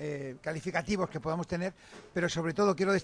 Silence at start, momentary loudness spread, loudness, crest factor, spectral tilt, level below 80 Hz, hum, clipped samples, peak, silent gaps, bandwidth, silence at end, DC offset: 0 s; 10 LU; -33 LUFS; 16 dB; -5.5 dB/octave; -58 dBFS; none; under 0.1%; -16 dBFS; none; 10.5 kHz; 0 s; under 0.1%